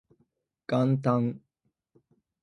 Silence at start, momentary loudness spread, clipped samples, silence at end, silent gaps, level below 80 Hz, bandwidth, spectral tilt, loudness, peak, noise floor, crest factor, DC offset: 0.7 s; 21 LU; under 0.1%; 1.05 s; none; -72 dBFS; 6.6 kHz; -9 dB/octave; -27 LUFS; -10 dBFS; -79 dBFS; 20 dB; under 0.1%